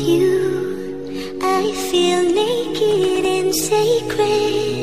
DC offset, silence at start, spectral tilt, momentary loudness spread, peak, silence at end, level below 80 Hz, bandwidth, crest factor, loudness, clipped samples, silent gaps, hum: 1%; 0 s; -4 dB/octave; 9 LU; -6 dBFS; 0 s; -50 dBFS; 15.5 kHz; 12 dB; -18 LUFS; under 0.1%; none; none